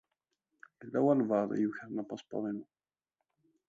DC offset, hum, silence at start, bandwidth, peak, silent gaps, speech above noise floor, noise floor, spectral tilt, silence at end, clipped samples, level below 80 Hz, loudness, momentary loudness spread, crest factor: under 0.1%; none; 0.8 s; 7.6 kHz; -16 dBFS; none; 56 dB; -88 dBFS; -8.5 dB/octave; 1.05 s; under 0.1%; -82 dBFS; -33 LUFS; 12 LU; 20 dB